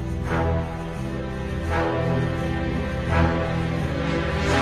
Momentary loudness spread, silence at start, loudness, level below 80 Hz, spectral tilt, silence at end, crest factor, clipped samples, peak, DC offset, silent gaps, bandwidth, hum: 8 LU; 0 s; -25 LUFS; -32 dBFS; -7 dB/octave; 0 s; 16 dB; under 0.1%; -6 dBFS; under 0.1%; none; 12.5 kHz; none